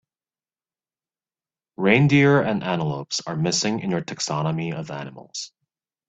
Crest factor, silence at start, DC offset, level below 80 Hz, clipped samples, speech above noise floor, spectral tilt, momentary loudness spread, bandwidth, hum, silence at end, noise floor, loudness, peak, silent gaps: 22 dB; 1.8 s; under 0.1%; -60 dBFS; under 0.1%; over 68 dB; -5 dB/octave; 17 LU; 8.4 kHz; none; 0.6 s; under -90 dBFS; -21 LUFS; -2 dBFS; none